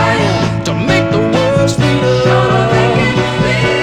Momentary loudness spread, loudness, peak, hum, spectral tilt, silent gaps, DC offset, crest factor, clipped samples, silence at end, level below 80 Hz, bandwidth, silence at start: 3 LU; -12 LUFS; 0 dBFS; none; -6 dB/octave; none; under 0.1%; 12 dB; under 0.1%; 0 s; -32 dBFS; 12 kHz; 0 s